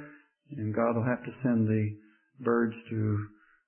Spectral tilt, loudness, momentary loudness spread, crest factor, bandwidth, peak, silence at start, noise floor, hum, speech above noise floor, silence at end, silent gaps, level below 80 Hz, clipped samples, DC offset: -12.5 dB/octave; -30 LUFS; 17 LU; 16 dB; 3.2 kHz; -14 dBFS; 0 s; -53 dBFS; none; 24 dB; 0.4 s; none; -68 dBFS; under 0.1%; under 0.1%